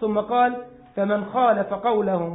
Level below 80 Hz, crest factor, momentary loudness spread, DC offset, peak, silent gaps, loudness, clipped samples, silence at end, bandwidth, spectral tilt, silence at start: -60 dBFS; 14 dB; 8 LU; under 0.1%; -8 dBFS; none; -22 LUFS; under 0.1%; 0 s; 4 kHz; -11 dB/octave; 0 s